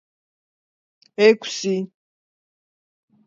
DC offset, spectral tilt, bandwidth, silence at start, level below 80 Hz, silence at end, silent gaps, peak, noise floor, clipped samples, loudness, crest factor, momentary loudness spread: under 0.1%; -4.5 dB/octave; 7.8 kHz; 1.2 s; -80 dBFS; 1.4 s; none; -2 dBFS; under -90 dBFS; under 0.1%; -19 LUFS; 22 dB; 19 LU